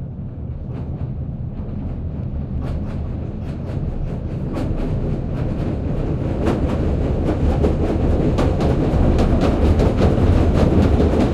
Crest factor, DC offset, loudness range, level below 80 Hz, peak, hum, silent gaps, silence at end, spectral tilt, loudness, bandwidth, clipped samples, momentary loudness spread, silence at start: 16 dB; under 0.1%; 10 LU; -24 dBFS; -2 dBFS; none; none; 0 s; -9 dB/octave; -20 LUFS; 9.6 kHz; under 0.1%; 12 LU; 0 s